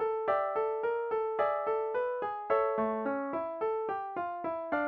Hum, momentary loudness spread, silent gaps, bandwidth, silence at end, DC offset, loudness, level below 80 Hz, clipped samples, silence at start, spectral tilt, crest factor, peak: none; 5 LU; none; 4.6 kHz; 0 s; under 0.1%; -32 LUFS; -72 dBFS; under 0.1%; 0 s; -8 dB/octave; 16 dB; -16 dBFS